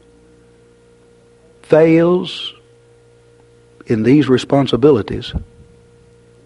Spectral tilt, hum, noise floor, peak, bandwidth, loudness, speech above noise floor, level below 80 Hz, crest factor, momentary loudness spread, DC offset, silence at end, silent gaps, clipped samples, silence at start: -7.5 dB/octave; none; -48 dBFS; 0 dBFS; 11 kHz; -14 LUFS; 35 dB; -42 dBFS; 18 dB; 15 LU; under 0.1%; 1 s; none; under 0.1%; 1.7 s